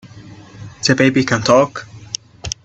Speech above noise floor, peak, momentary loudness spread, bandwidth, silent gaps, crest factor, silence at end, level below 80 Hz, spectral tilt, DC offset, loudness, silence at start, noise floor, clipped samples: 24 dB; 0 dBFS; 20 LU; 8.4 kHz; none; 18 dB; 0.1 s; -46 dBFS; -4.5 dB/octave; under 0.1%; -15 LUFS; 0.15 s; -38 dBFS; under 0.1%